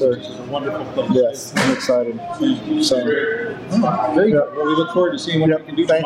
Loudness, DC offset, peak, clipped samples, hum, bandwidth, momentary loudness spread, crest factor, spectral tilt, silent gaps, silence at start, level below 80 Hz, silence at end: -19 LUFS; under 0.1%; -6 dBFS; under 0.1%; none; 15 kHz; 8 LU; 12 dB; -5.5 dB/octave; none; 0 s; -56 dBFS; 0 s